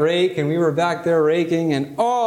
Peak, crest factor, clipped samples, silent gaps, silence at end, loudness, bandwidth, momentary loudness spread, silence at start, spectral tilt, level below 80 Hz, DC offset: -6 dBFS; 12 dB; under 0.1%; none; 0 s; -19 LUFS; 14 kHz; 3 LU; 0 s; -6.5 dB/octave; -62 dBFS; under 0.1%